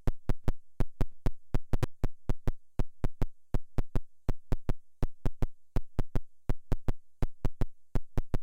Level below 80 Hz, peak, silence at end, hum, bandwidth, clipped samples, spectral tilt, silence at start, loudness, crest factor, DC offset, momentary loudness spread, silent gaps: -34 dBFS; -12 dBFS; 0 s; none; 4.9 kHz; under 0.1%; -8 dB/octave; 0.05 s; -39 LUFS; 16 dB; under 0.1%; 4 LU; none